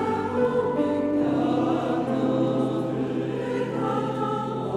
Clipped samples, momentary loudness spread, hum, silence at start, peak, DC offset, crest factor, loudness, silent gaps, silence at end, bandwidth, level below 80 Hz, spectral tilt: under 0.1%; 4 LU; none; 0 s; -12 dBFS; under 0.1%; 12 dB; -25 LUFS; none; 0 s; 11 kHz; -58 dBFS; -8 dB/octave